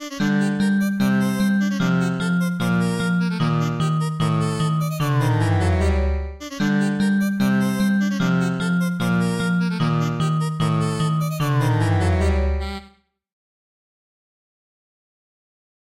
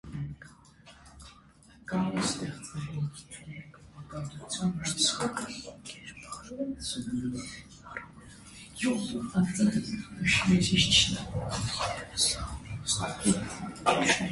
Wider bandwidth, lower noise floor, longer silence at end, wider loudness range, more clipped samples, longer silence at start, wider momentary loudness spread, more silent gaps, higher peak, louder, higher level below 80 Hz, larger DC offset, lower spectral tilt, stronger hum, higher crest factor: first, 15.5 kHz vs 11.5 kHz; second, -52 dBFS vs -57 dBFS; first, 3.1 s vs 0 s; second, 3 LU vs 10 LU; neither; about the same, 0 s vs 0.05 s; second, 3 LU vs 21 LU; neither; about the same, -8 dBFS vs -8 dBFS; first, -21 LUFS vs -29 LUFS; first, -34 dBFS vs -50 dBFS; first, 0.2% vs under 0.1%; first, -6.5 dB/octave vs -3.5 dB/octave; neither; second, 12 dB vs 24 dB